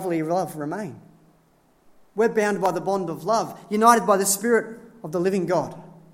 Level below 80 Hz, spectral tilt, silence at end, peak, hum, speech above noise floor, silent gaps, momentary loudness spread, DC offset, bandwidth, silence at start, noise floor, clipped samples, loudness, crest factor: -68 dBFS; -4.5 dB/octave; 0.25 s; 0 dBFS; none; 38 dB; none; 17 LU; under 0.1%; 16.5 kHz; 0 s; -60 dBFS; under 0.1%; -22 LUFS; 22 dB